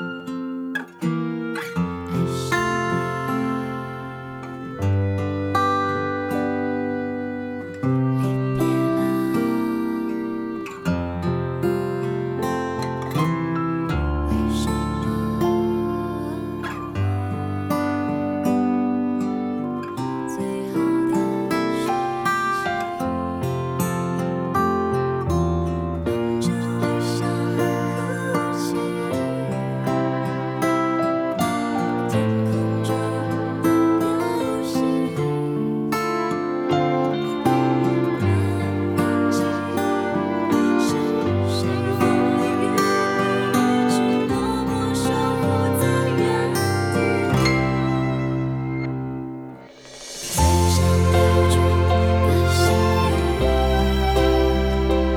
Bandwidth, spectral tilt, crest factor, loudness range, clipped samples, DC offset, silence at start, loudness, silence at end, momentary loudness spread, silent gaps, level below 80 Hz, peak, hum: 18 kHz; -6.5 dB/octave; 16 dB; 5 LU; under 0.1%; under 0.1%; 0 s; -22 LUFS; 0 s; 8 LU; none; -34 dBFS; -6 dBFS; none